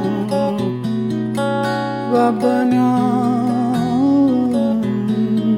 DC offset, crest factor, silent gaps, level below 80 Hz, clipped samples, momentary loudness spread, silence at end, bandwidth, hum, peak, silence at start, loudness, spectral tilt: 0.1%; 14 dB; none; -58 dBFS; under 0.1%; 6 LU; 0 s; 13 kHz; none; -4 dBFS; 0 s; -17 LUFS; -7.5 dB/octave